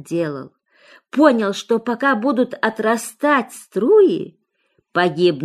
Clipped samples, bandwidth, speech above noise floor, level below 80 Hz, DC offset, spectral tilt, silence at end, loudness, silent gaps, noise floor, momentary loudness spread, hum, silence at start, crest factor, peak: under 0.1%; 13.5 kHz; 48 dB; -70 dBFS; under 0.1%; -5 dB/octave; 0 s; -18 LUFS; none; -66 dBFS; 12 LU; none; 0.05 s; 16 dB; -2 dBFS